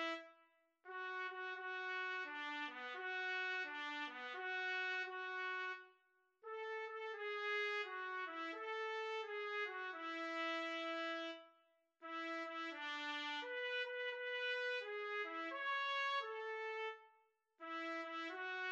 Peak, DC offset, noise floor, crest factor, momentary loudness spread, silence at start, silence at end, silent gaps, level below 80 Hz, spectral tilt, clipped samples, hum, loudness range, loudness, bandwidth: -30 dBFS; under 0.1%; -78 dBFS; 16 dB; 7 LU; 0 s; 0 s; none; under -90 dBFS; 0 dB/octave; under 0.1%; none; 3 LU; -44 LUFS; 8.4 kHz